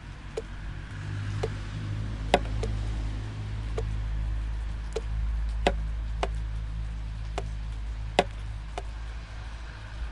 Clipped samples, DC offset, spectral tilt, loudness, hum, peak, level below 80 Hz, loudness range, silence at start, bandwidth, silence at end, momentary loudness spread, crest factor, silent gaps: under 0.1%; under 0.1%; -6 dB/octave; -34 LUFS; none; -4 dBFS; -34 dBFS; 2 LU; 0 s; 11 kHz; 0 s; 11 LU; 28 dB; none